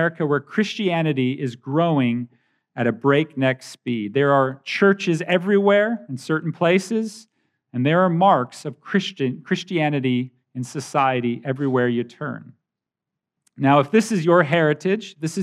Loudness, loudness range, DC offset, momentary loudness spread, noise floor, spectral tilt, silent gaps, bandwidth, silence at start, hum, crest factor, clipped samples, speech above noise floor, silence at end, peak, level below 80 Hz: -21 LUFS; 4 LU; under 0.1%; 13 LU; -85 dBFS; -6.5 dB/octave; none; 13 kHz; 0 s; none; 18 dB; under 0.1%; 65 dB; 0 s; -2 dBFS; -82 dBFS